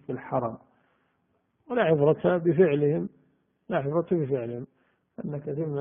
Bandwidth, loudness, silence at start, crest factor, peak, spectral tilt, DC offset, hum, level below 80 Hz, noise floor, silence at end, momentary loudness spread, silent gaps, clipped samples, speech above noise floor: 3.7 kHz; -26 LUFS; 0.1 s; 18 dB; -8 dBFS; -7.5 dB/octave; under 0.1%; none; -66 dBFS; -72 dBFS; 0 s; 16 LU; none; under 0.1%; 47 dB